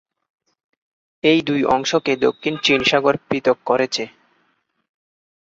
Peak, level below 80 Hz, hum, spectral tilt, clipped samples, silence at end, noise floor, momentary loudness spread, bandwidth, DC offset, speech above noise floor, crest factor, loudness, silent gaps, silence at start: -2 dBFS; -58 dBFS; none; -4 dB/octave; under 0.1%; 1.35 s; -66 dBFS; 5 LU; 8 kHz; under 0.1%; 48 dB; 18 dB; -18 LUFS; none; 1.25 s